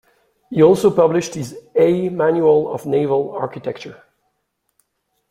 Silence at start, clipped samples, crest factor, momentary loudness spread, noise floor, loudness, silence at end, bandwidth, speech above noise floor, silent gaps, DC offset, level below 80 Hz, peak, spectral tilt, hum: 0.5 s; under 0.1%; 16 dB; 15 LU; -71 dBFS; -17 LUFS; 1.35 s; 15 kHz; 55 dB; none; under 0.1%; -58 dBFS; -2 dBFS; -6.5 dB/octave; none